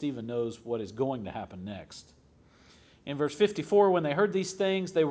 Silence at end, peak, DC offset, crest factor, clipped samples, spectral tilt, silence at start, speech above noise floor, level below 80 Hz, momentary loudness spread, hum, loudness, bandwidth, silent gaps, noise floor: 0 s; -12 dBFS; under 0.1%; 18 dB; under 0.1%; -5.5 dB/octave; 0 s; 31 dB; -64 dBFS; 17 LU; none; -29 LUFS; 8 kHz; none; -60 dBFS